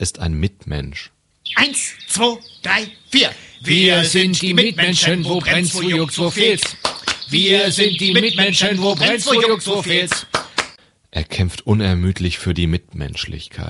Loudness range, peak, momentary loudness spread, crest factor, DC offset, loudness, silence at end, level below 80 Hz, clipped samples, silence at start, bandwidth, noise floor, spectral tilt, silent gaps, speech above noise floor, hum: 5 LU; 0 dBFS; 13 LU; 18 dB; under 0.1%; -16 LUFS; 0 s; -38 dBFS; under 0.1%; 0 s; 11.5 kHz; -41 dBFS; -3.5 dB/octave; none; 23 dB; none